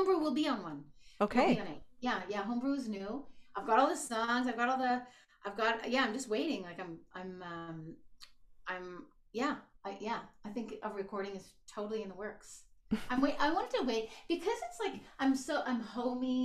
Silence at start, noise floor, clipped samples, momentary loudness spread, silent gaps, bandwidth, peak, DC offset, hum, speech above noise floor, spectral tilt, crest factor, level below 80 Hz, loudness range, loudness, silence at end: 0 s; -56 dBFS; under 0.1%; 15 LU; none; 14 kHz; -16 dBFS; under 0.1%; none; 21 dB; -4.5 dB/octave; 20 dB; -62 dBFS; 9 LU; -36 LUFS; 0 s